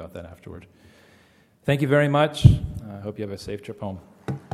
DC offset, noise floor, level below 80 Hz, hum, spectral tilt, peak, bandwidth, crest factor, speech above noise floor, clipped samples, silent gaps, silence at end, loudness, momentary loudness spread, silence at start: under 0.1%; -57 dBFS; -38 dBFS; none; -7.5 dB/octave; 0 dBFS; 13 kHz; 24 dB; 35 dB; under 0.1%; none; 0.15 s; -22 LUFS; 23 LU; 0 s